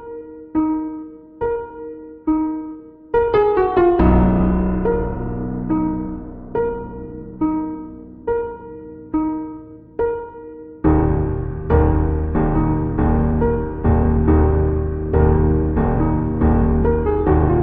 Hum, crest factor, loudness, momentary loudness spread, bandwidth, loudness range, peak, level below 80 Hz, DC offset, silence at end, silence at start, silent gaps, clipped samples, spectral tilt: none; 16 dB; -19 LUFS; 17 LU; 4 kHz; 7 LU; -2 dBFS; -24 dBFS; under 0.1%; 0 s; 0 s; none; under 0.1%; -12.5 dB/octave